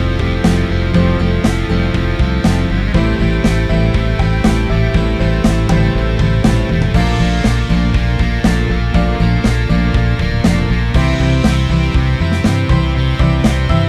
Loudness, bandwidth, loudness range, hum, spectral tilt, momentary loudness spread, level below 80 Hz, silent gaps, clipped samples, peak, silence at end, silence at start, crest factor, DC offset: -14 LUFS; 12 kHz; 1 LU; none; -7 dB/octave; 2 LU; -18 dBFS; none; under 0.1%; 0 dBFS; 0 s; 0 s; 12 dB; under 0.1%